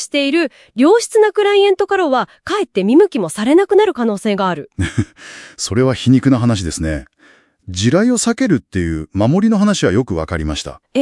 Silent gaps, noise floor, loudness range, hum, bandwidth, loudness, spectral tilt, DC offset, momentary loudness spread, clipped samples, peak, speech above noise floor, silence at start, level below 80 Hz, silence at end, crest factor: none; -50 dBFS; 3 LU; none; 12 kHz; -15 LUFS; -5.5 dB/octave; under 0.1%; 10 LU; under 0.1%; 0 dBFS; 36 dB; 0 s; -40 dBFS; 0 s; 14 dB